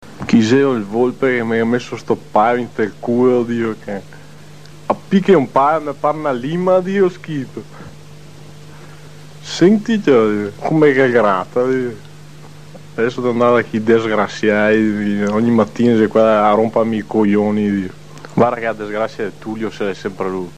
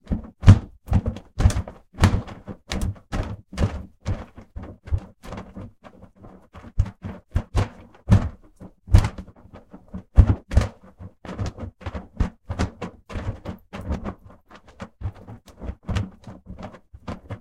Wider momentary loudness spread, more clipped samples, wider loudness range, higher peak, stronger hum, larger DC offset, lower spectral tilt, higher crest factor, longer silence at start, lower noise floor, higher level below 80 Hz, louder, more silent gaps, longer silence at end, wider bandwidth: second, 12 LU vs 22 LU; neither; second, 5 LU vs 11 LU; about the same, -2 dBFS vs 0 dBFS; neither; first, 1% vs 0.1%; about the same, -7 dB/octave vs -7 dB/octave; second, 14 dB vs 24 dB; about the same, 0 s vs 0.1 s; second, -39 dBFS vs -49 dBFS; second, -54 dBFS vs -30 dBFS; first, -16 LUFS vs -25 LUFS; neither; about the same, 0.05 s vs 0.05 s; about the same, 10 kHz vs 11 kHz